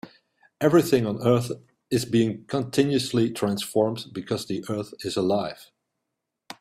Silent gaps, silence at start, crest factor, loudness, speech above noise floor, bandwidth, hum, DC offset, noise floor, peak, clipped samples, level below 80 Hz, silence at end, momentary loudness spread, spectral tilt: none; 0.05 s; 18 dB; -25 LUFS; 59 dB; 16 kHz; none; under 0.1%; -82 dBFS; -6 dBFS; under 0.1%; -62 dBFS; 0.1 s; 13 LU; -6 dB/octave